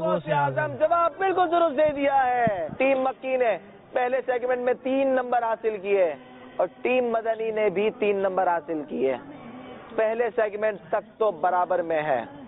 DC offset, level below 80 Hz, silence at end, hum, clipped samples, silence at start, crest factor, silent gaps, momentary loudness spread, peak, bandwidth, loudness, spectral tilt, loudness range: under 0.1%; -62 dBFS; 0 s; none; under 0.1%; 0 s; 14 dB; none; 8 LU; -10 dBFS; 4 kHz; -25 LUFS; -10 dB/octave; 3 LU